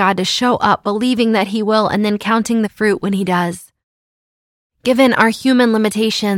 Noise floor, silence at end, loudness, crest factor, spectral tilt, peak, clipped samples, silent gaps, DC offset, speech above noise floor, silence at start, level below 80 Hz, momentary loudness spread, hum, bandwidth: under -90 dBFS; 0 s; -15 LUFS; 16 dB; -5 dB/octave; 0 dBFS; under 0.1%; 3.83-4.70 s; under 0.1%; over 75 dB; 0 s; -54 dBFS; 5 LU; none; 16.5 kHz